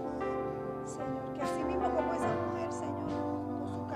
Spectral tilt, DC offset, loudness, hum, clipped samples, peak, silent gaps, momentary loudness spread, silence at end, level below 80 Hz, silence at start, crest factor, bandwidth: -6.5 dB/octave; under 0.1%; -35 LUFS; 60 Hz at -55 dBFS; under 0.1%; -20 dBFS; none; 6 LU; 0 s; -56 dBFS; 0 s; 16 dB; 14 kHz